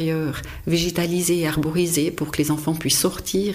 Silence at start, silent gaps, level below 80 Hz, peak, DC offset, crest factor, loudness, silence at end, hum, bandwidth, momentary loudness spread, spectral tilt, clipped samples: 0 s; none; -42 dBFS; -6 dBFS; under 0.1%; 16 dB; -22 LUFS; 0 s; none; 15.5 kHz; 5 LU; -4.5 dB/octave; under 0.1%